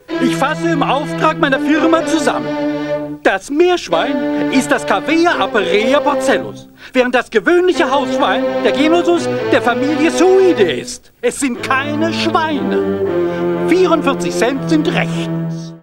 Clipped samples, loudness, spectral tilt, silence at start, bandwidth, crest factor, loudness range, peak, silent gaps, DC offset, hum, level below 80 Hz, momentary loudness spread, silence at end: under 0.1%; -14 LUFS; -5 dB/octave; 0.1 s; 16.5 kHz; 14 dB; 2 LU; 0 dBFS; none; under 0.1%; none; -48 dBFS; 7 LU; 0.05 s